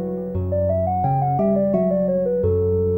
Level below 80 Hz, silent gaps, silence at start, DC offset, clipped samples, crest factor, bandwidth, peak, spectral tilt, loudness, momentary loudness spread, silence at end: -44 dBFS; none; 0 s; under 0.1%; under 0.1%; 12 dB; 2.7 kHz; -8 dBFS; -13 dB/octave; -20 LUFS; 4 LU; 0 s